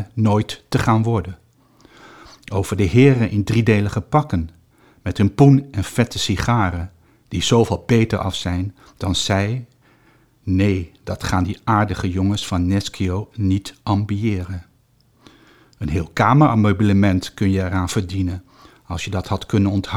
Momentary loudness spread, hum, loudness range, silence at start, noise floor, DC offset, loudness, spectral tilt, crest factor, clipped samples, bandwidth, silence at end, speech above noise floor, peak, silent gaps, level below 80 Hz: 14 LU; none; 5 LU; 0 s; -58 dBFS; 0.3%; -19 LUFS; -6.5 dB/octave; 18 dB; under 0.1%; 14 kHz; 0 s; 40 dB; 0 dBFS; none; -40 dBFS